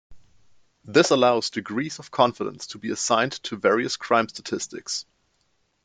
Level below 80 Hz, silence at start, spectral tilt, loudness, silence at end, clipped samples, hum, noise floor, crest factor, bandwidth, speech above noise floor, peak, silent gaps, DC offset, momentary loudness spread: -66 dBFS; 0.1 s; -3.5 dB/octave; -24 LUFS; 0.85 s; under 0.1%; none; -69 dBFS; 22 dB; 9.6 kHz; 46 dB; -4 dBFS; none; under 0.1%; 12 LU